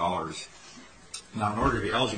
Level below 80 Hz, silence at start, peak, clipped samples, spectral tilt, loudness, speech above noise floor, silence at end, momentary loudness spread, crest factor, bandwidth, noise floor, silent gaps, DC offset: -46 dBFS; 0 s; -12 dBFS; under 0.1%; -4.5 dB/octave; -29 LUFS; 22 dB; 0 s; 21 LU; 18 dB; 9.6 kHz; -50 dBFS; none; under 0.1%